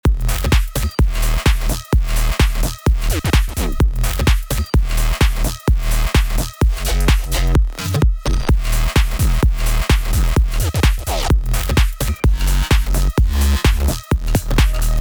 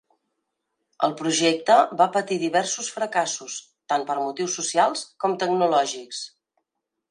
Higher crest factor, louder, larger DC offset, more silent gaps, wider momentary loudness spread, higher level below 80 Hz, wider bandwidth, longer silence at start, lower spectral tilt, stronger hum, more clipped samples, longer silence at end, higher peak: second, 14 dB vs 20 dB; first, -18 LUFS vs -23 LUFS; neither; neither; second, 3 LU vs 13 LU; first, -16 dBFS vs -78 dBFS; first, over 20 kHz vs 11 kHz; second, 0.05 s vs 1 s; first, -5 dB/octave vs -2.5 dB/octave; neither; neither; second, 0 s vs 0.85 s; first, 0 dBFS vs -4 dBFS